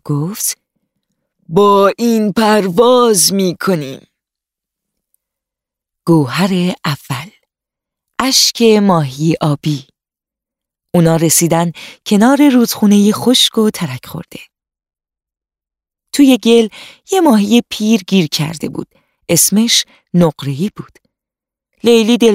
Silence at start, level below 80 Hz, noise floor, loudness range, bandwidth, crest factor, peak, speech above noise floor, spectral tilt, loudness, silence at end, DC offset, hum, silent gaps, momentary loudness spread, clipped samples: 0.05 s; -52 dBFS; -88 dBFS; 7 LU; 16 kHz; 14 dB; 0 dBFS; 76 dB; -4.5 dB/octave; -12 LUFS; 0 s; under 0.1%; none; none; 13 LU; under 0.1%